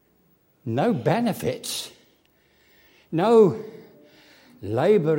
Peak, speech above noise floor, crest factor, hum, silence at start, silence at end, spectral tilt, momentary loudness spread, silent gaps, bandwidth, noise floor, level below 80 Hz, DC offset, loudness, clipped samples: -6 dBFS; 42 dB; 18 dB; none; 0.65 s; 0 s; -6 dB/octave; 22 LU; none; 16.5 kHz; -63 dBFS; -64 dBFS; under 0.1%; -22 LUFS; under 0.1%